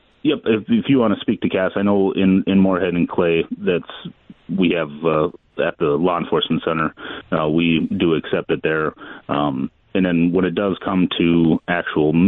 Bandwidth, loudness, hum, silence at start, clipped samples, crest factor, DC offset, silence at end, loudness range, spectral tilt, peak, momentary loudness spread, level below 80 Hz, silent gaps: 4 kHz; -19 LUFS; none; 0.25 s; under 0.1%; 12 dB; under 0.1%; 0 s; 3 LU; -10.5 dB/octave; -6 dBFS; 8 LU; -50 dBFS; none